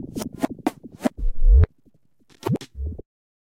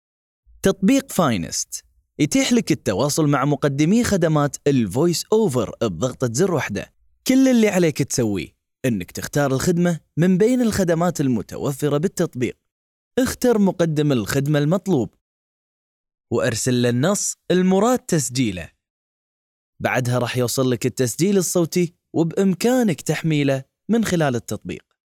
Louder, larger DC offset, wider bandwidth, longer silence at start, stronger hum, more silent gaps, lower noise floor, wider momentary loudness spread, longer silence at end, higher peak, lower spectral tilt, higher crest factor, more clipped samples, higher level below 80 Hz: second, -25 LUFS vs -20 LUFS; neither; second, 15.5 kHz vs 17.5 kHz; second, 0 s vs 0.65 s; neither; second, none vs 12.72-13.11 s, 15.21-16.04 s, 18.90-19.73 s; second, -62 dBFS vs under -90 dBFS; first, 15 LU vs 9 LU; first, 0.55 s vs 0.35 s; about the same, -4 dBFS vs -4 dBFS; first, -7.5 dB/octave vs -5.5 dB/octave; about the same, 18 dB vs 16 dB; neither; first, -24 dBFS vs -52 dBFS